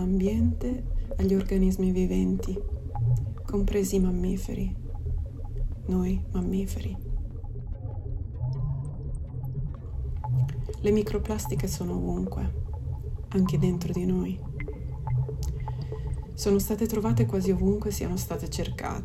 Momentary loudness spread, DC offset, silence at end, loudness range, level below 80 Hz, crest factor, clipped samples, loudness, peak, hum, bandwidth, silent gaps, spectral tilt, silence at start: 11 LU; under 0.1%; 0 s; 5 LU; -34 dBFS; 16 dB; under 0.1%; -29 LUFS; -12 dBFS; none; 14.5 kHz; none; -7.5 dB/octave; 0 s